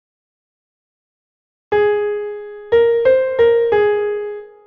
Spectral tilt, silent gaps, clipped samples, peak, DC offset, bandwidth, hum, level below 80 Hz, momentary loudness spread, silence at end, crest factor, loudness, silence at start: -7 dB/octave; none; under 0.1%; -4 dBFS; under 0.1%; 4.6 kHz; none; -52 dBFS; 12 LU; 0.2 s; 14 dB; -16 LUFS; 1.7 s